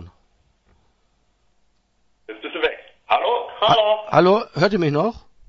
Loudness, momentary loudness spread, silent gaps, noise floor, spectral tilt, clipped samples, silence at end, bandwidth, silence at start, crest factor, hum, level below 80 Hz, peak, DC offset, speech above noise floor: -19 LUFS; 16 LU; none; -64 dBFS; -6.5 dB/octave; under 0.1%; 0.3 s; 7.4 kHz; 0 s; 20 dB; none; -54 dBFS; -2 dBFS; under 0.1%; 47 dB